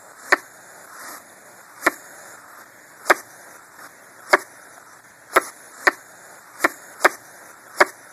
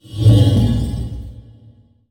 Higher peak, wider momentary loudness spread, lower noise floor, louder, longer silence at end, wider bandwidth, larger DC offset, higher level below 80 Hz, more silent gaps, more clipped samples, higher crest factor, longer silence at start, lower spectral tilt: about the same, 0 dBFS vs 0 dBFS; first, 23 LU vs 20 LU; about the same, -47 dBFS vs -47 dBFS; second, -21 LUFS vs -15 LUFS; second, 0.2 s vs 0.7 s; first, 16 kHz vs 10.5 kHz; neither; second, -70 dBFS vs -28 dBFS; neither; neither; first, 26 dB vs 16 dB; first, 0.3 s vs 0.1 s; second, -1 dB/octave vs -8 dB/octave